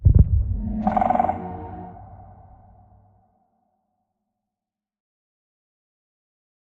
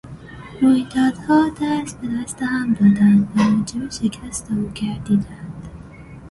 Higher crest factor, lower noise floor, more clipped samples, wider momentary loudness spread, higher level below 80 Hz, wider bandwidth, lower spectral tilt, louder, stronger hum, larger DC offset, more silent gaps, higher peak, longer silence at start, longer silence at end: first, 22 dB vs 16 dB; first, -88 dBFS vs -38 dBFS; neither; about the same, 23 LU vs 22 LU; first, -30 dBFS vs -46 dBFS; second, 3.5 kHz vs 11.5 kHz; first, -11.5 dB/octave vs -6 dB/octave; second, -22 LUFS vs -19 LUFS; neither; neither; neither; about the same, -2 dBFS vs -4 dBFS; about the same, 0 s vs 0.05 s; first, 4.55 s vs 0 s